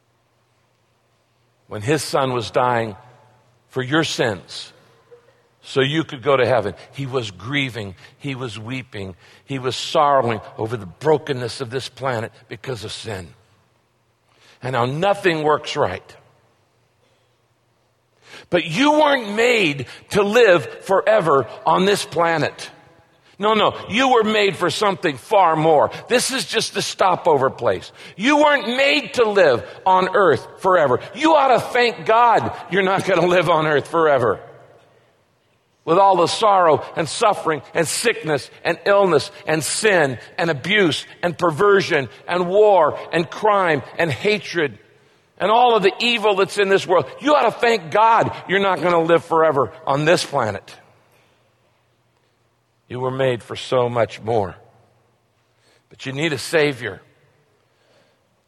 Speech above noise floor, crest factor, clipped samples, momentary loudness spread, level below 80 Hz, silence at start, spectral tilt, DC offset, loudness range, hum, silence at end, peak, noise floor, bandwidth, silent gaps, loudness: 45 dB; 16 dB; under 0.1%; 14 LU; -60 dBFS; 1.7 s; -4.5 dB/octave; under 0.1%; 9 LU; none; 1.5 s; -4 dBFS; -63 dBFS; 13 kHz; none; -18 LUFS